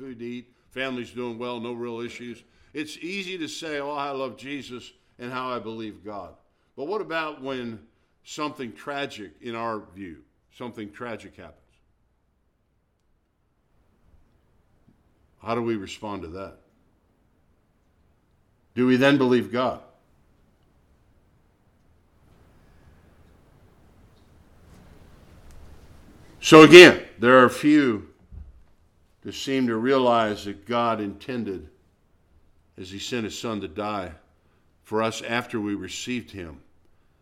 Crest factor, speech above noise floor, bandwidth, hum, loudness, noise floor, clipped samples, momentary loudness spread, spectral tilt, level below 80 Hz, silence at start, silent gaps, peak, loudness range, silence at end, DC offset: 24 dB; 47 dB; 15 kHz; none; -21 LUFS; -69 dBFS; under 0.1%; 22 LU; -4.5 dB/octave; -58 dBFS; 0 s; none; 0 dBFS; 21 LU; 0.65 s; under 0.1%